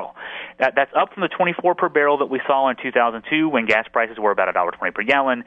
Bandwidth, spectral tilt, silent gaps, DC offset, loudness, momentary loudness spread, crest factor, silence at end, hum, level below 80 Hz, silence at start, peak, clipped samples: 8.2 kHz; -6 dB/octave; none; under 0.1%; -19 LUFS; 5 LU; 18 dB; 0.05 s; none; -62 dBFS; 0 s; -2 dBFS; under 0.1%